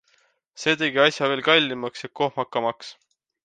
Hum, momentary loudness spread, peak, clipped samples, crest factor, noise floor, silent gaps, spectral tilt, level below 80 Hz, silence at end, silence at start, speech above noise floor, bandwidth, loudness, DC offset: none; 13 LU; -2 dBFS; under 0.1%; 22 dB; -65 dBFS; none; -3.5 dB/octave; -72 dBFS; 0.55 s; 0.55 s; 42 dB; 9.4 kHz; -22 LUFS; under 0.1%